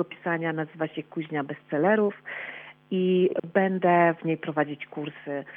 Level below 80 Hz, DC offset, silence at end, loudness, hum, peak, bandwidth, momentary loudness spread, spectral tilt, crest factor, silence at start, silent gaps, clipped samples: -86 dBFS; under 0.1%; 0 s; -27 LUFS; none; -10 dBFS; 3.8 kHz; 14 LU; -10 dB/octave; 18 dB; 0 s; none; under 0.1%